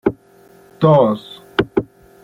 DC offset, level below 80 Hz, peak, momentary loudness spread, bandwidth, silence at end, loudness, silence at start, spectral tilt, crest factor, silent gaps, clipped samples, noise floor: under 0.1%; -46 dBFS; -2 dBFS; 13 LU; 5.8 kHz; 0.4 s; -17 LUFS; 0.05 s; -8.5 dB/octave; 16 dB; none; under 0.1%; -48 dBFS